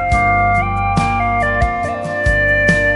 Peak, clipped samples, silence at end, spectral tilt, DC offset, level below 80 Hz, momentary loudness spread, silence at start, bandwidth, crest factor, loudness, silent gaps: 0 dBFS; under 0.1%; 0 s; -6 dB/octave; under 0.1%; -24 dBFS; 6 LU; 0 s; 11.5 kHz; 14 dB; -15 LUFS; none